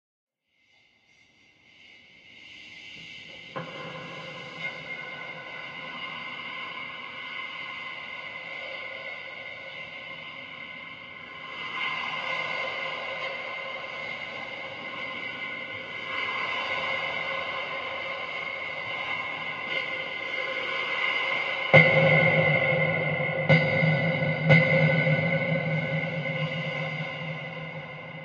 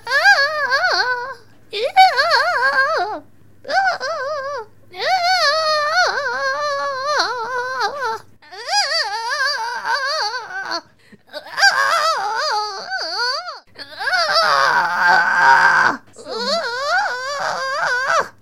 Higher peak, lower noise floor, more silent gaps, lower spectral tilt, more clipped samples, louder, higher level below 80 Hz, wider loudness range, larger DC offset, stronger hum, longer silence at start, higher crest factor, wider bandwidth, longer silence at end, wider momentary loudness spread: about the same, -2 dBFS vs 0 dBFS; first, -68 dBFS vs -49 dBFS; neither; first, -6.5 dB/octave vs -0.5 dB/octave; neither; second, -27 LUFS vs -17 LUFS; about the same, -66 dBFS vs -68 dBFS; first, 16 LU vs 5 LU; second, under 0.1% vs 0.4%; neither; first, 1.8 s vs 0.05 s; first, 26 dB vs 18 dB; second, 7.2 kHz vs 16.5 kHz; about the same, 0 s vs 0.1 s; first, 17 LU vs 14 LU